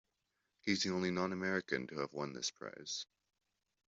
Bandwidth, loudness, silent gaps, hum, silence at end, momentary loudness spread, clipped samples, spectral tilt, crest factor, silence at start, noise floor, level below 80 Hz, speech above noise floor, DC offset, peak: 8 kHz; -39 LUFS; none; none; 0.9 s; 8 LU; under 0.1%; -3.5 dB/octave; 20 dB; 0.65 s; -85 dBFS; -78 dBFS; 46 dB; under 0.1%; -20 dBFS